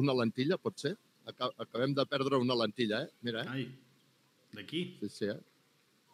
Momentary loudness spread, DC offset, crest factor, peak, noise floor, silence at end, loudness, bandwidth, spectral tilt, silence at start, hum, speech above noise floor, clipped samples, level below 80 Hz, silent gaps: 15 LU; under 0.1%; 20 dB; -16 dBFS; -70 dBFS; 0.75 s; -35 LUFS; 15 kHz; -6 dB/octave; 0 s; none; 36 dB; under 0.1%; under -90 dBFS; none